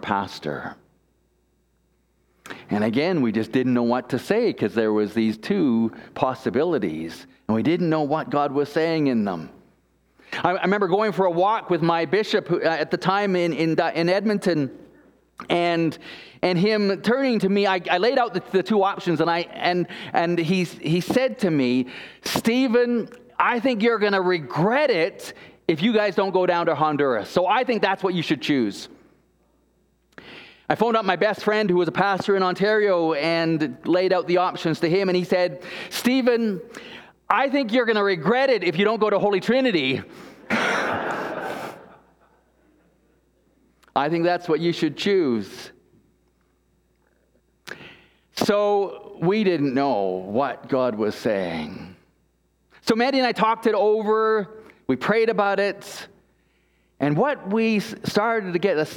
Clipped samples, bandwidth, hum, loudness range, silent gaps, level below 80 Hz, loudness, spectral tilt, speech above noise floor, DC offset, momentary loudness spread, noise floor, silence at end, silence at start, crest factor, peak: under 0.1%; 18 kHz; none; 5 LU; none; -64 dBFS; -22 LUFS; -6 dB/octave; 44 dB; under 0.1%; 11 LU; -66 dBFS; 0 s; 0 s; 22 dB; 0 dBFS